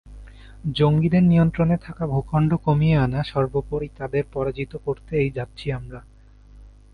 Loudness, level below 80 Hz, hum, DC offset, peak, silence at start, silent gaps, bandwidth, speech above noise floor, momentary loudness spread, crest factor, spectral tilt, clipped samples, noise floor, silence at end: -22 LUFS; -40 dBFS; 50 Hz at -40 dBFS; under 0.1%; -6 dBFS; 0.05 s; none; 5 kHz; 26 dB; 12 LU; 16 dB; -9.5 dB/octave; under 0.1%; -47 dBFS; 0.25 s